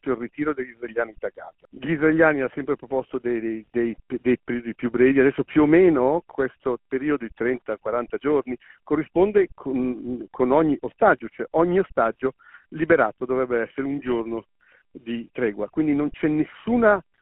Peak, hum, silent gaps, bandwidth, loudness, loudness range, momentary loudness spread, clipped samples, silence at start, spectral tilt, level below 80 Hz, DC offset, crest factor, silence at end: -4 dBFS; none; none; 4 kHz; -23 LUFS; 5 LU; 12 LU; under 0.1%; 0.05 s; -6 dB/octave; -54 dBFS; under 0.1%; 20 dB; 0.2 s